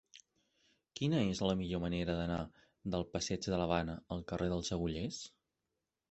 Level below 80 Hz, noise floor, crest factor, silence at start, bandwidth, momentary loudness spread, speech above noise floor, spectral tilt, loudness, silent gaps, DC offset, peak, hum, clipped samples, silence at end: -54 dBFS; -89 dBFS; 22 dB; 0.15 s; 8.2 kHz; 11 LU; 52 dB; -5.5 dB/octave; -37 LUFS; none; under 0.1%; -16 dBFS; none; under 0.1%; 0.8 s